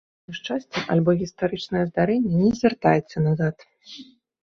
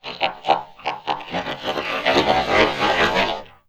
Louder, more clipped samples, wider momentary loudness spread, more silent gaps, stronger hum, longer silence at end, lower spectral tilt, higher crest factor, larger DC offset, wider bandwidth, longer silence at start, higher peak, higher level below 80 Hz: second, -23 LUFS vs -20 LUFS; neither; first, 19 LU vs 10 LU; neither; neither; first, 0.4 s vs 0.2 s; first, -7.5 dB/octave vs -4 dB/octave; about the same, 20 dB vs 20 dB; second, under 0.1% vs 0.2%; second, 7 kHz vs 15.5 kHz; first, 0.3 s vs 0.05 s; about the same, -2 dBFS vs 0 dBFS; second, -54 dBFS vs -44 dBFS